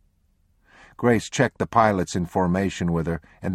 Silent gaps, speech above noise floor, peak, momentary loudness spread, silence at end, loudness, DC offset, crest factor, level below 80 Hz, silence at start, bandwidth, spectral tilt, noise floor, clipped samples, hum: none; 42 dB; -2 dBFS; 6 LU; 0 s; -23 LUFS; under 0.1%; 22 dB; -48 dBFS; 1 s; 13.5 kHz; -6 dB/octave; -64 dBFS; under 0.1%; none